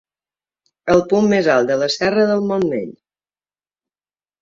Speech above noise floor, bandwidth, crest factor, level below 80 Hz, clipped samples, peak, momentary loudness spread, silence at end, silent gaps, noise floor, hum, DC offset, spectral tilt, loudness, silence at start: over 74 dB; 7.8 kHz; 18 dB; -54 dBFS; under 0.1%; -2 dBFS; 10 LU; 1.5 s; none; under -90 dBFS; none; under 0.1%; -5.5 dB/octave; -16 LUFS; 0.85 s